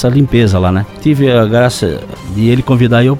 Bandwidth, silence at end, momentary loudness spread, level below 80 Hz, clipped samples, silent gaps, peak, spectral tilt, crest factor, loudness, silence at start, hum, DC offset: 14.5 kHz; 0 s; 8 LU; -32 dBFS; under 0.1%; none; 0 dBFS; -7 dB/octave; 10 dB; -11 LUFS; 0 s; none; under 0.1%